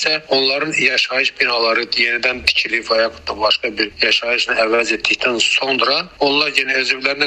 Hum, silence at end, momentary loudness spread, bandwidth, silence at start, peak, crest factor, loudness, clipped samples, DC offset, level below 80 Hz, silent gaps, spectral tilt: none; 0 s; 3 LU; 13.5 kHz; 0 s; 0 dBFS; 16 dB; -15 LUFS; under 0.1%; under 0.1%; -50 dBFS; none; -1.5 dB/octave